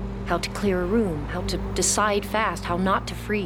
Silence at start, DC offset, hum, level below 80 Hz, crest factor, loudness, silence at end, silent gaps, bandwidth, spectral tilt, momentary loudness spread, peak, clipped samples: 0 s; under 0.1%; none; -36 dBFS; 16 dB; -24 LUFS; 0 s; none; 18 kHz; -4 dB/octave; 7 LU; -10 dBFS; under 0.1%